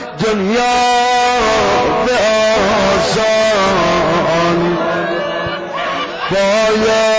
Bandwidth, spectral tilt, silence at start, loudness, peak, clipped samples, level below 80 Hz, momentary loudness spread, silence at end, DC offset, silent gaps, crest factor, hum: 8 kHz; -4 dB/octave; 0 s; -13 LUFS; -4 dBFS; under 0.1%; -38 dBFS; 7 LU; 0 s; under 0.1%; none; 8 dB; none